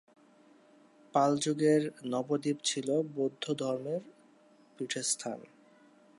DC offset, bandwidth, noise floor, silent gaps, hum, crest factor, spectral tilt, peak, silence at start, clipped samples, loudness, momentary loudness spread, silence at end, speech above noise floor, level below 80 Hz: under 0.1%; 11.5 kHz; -62 dBFS; none; none; 20 dB; -4 dB/octave; -14 dBFS; 1.15 s; under 0.1%; -32 LUFS; 11 LU; 0.75 s; 31 dB; -84 dBFS